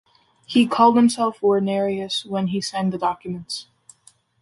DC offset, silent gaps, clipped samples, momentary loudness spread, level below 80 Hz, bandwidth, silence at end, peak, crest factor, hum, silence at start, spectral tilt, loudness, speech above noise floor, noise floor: under 0.1%; none; under 0.1%; 14 LU; -64 dBFS; 11.5 kHz; 0.8 s; -4 dBFS; 18 dB; none; 0.5 s; -5.5 dB/octave; -20 LUFS; 36 dB; -56 dBFS